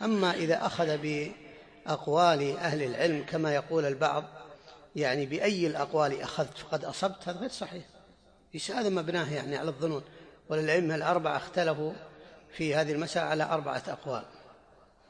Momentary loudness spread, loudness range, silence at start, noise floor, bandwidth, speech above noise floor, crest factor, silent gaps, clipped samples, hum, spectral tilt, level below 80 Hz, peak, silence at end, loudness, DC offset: 13 LU; 5 LU; 0 s; -60 dBFS; 10.5 kHz; 30 dB; 20 dB; none; under 0.1%; none; -5 dB/octave; -68 dBFS; -12 dBFS; 0.55 s; -30 LUFS; under 0.1%